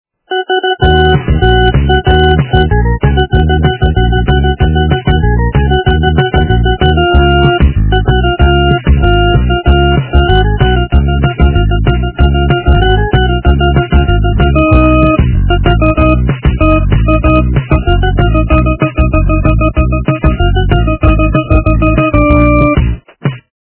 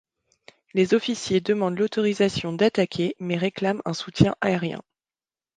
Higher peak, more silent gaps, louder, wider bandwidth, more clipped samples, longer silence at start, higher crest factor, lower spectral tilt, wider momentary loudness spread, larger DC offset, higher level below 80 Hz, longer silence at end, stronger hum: about the same, 0 dBFS vs -2 dBFS; neither; first, -10 LUFS vs -24 LUFS; second, 4 kHz vs 9.6 kHz; first, 0.9% vs under 0.1%; second, 0.3 s vs 0.75 s; second, 8 dB vs 24 dB; first, -11 dB/octave vs -6 dB/octave; second, 3 LU vs 7 LU; neither; first, -12 dBFS vs -52 dBFS; second, 0.35 s vs 0.75 s; neither